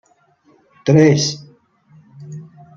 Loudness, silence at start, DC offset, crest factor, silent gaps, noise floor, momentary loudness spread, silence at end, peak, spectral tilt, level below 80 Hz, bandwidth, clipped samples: -14 LUFS; 0.85 s; under 0.1%; 18 dB; none; -56 dBFS; 24 LU; 0.35 s; -2 dBFS; -5.5 dB/octave; -56 dBFS; 7.6 kHz; under 0.1%